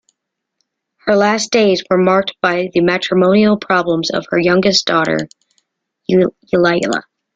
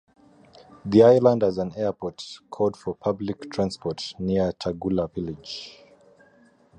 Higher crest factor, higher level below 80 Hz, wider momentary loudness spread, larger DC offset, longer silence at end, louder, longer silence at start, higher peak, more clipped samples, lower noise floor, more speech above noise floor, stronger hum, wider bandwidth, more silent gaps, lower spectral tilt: second, 14 dB vs 20 dB; about the same, -54 dBFS vs -52 dBFS; second, 6 LU vs 19 LU; neither; second, 0.35 s vs 1.1 s; first, -14 LUFS vs -24 LUFS; first, 1.05 s vs 0.85 s; about the same, -2 dBFS vs -4 dBFS; neither; first, -75 dBFS vs -57 dBFS; first, 61 dB vs 34 dB; neither; second, 9 kHz vs 10 kHz; neither; second, -5 dB/octave vs -7 dB/octave